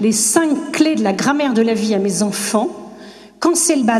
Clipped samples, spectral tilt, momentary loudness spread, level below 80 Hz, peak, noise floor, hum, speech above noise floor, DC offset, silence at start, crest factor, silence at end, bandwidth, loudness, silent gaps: under 0.1%; -3.5 dB/octave; 6 LU; -60 dBFS; 0 dBFS; -38 dBFS; none; 23 dB; under 0.1%; 0 s; 16 dB; 0 s; 14 kHz; -16 LUFS; none